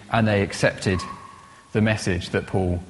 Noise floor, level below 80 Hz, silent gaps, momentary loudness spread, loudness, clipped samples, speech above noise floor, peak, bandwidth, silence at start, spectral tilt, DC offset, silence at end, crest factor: -45 dBFS; -48 dBFS; none; 8 LU; -23 LUFS; under 0.1%; 23 dB; -4 dBFS; 11.5 kHz; 0 s; -6 dB/octave; under 0.1%; 0 s; 20 dB